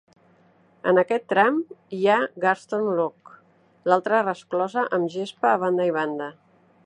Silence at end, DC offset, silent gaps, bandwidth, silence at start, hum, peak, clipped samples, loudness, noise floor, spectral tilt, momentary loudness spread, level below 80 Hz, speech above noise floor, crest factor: 0.55 s; under 0.1%; none; 10 kHz; 0.85 s; none; -2 dBFS; under 0.1%; -23 LUFS; -58 dBFS; -6 dB/octave; 9 LU; -78 dBFS; 36 dB; 22 dB